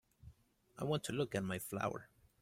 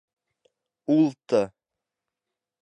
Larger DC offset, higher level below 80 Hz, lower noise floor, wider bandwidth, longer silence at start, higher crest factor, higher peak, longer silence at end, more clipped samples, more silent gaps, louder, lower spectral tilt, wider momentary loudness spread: neither; about the same, -68 dBFS vs -72 dBFS; second, -66 dBFS vs -87 dBFS; first, 16.5 kHz vs 8.8 kHz; second, 0.25 s vs 0.9 s; about the same, 18 dB vs 20 dB; second, -24 dBFS vs -8 dBFS; second, 0.35 s vs 1.15 s; neither; neither; second, -41 LUFS vs -24 LUFS; second, -5 dB/octave vs -7.5 dB/octave; second, 6 LU vs 12 LU